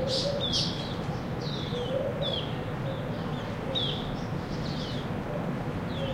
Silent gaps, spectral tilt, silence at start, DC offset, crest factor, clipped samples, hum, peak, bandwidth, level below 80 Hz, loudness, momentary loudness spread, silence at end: none; -5.5 dB/octave; 0 s; under 0.1%; 16 dB; under 0.1%; none; -14 dBFS; 16 kHz; -46 dBFS; -31 LUFS; 6 LU; 0 s